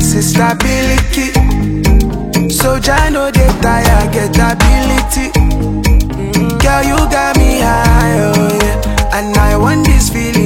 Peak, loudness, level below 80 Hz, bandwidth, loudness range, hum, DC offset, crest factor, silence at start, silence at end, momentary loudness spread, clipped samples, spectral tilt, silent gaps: 0 dBFS; -11 LUFS; -14 dBFS; 17 kHz; 1 LU; none; under 0.1%; 10 dB; 0 s; 0 s; 4 LU; under 0.1%; -5 dB/octave; none